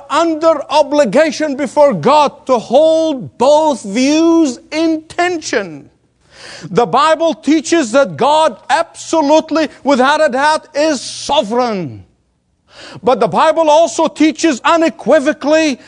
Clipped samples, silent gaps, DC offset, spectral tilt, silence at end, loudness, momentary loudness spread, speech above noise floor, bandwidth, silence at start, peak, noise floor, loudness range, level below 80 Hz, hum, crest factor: under 0.1%; none; under 0.1%; -4 dB/octave; 0.1 s; -12 LUFS; 7 LU; 48 dB; 10.5 kHz; 0 s; 0 dBFS; -60 dBFS; 4 LU; -56 dBFS; none; 12 dB